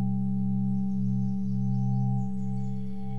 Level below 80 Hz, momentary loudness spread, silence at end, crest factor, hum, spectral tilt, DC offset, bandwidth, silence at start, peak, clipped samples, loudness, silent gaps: -60 dBFS; 5 LU; 0 s; 8 dB; none; -11.5 dB/octave; 2%; 2.3 kHz; 0 s; -18 dBFS; under 0.1%; -29 LUFS; none